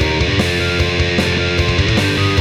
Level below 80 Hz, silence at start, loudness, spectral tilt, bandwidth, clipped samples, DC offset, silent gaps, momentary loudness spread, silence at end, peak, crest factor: -26 dBFS; 0 s; -15 LUFS; -5 dB/octave; 15 kHz; under 0.1%; under 0.1%; none; 1 LU; 0 s; -2 dBFS; 12 dB